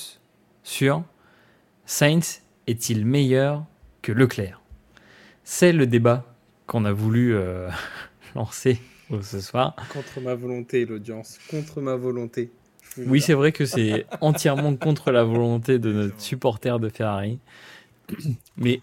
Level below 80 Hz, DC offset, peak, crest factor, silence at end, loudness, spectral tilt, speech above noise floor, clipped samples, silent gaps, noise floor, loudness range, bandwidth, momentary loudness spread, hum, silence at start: -58 dBFS; under 0.1%; -2 dBFS; 22 dB; 0 s; -23 LUFS; -6 dB/octave; 37 dB; under 0.1%; none; -59 dBFS; 7 LU; 17 kHz; 15 LU; none; 0 s